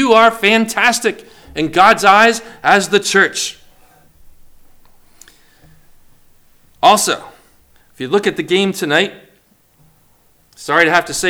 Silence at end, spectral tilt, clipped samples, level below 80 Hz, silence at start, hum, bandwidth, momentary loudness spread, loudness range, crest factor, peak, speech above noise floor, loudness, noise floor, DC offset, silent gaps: 0 s; -2.5 dB/octave; 0.1%; -50 dBFS; 0 s; none; over 20 kHz; 13 LU; 8 LU; 16 dB; 0 dBFS; 41 dB; -13 LUFS; -54 dBFS; under 0.1%; none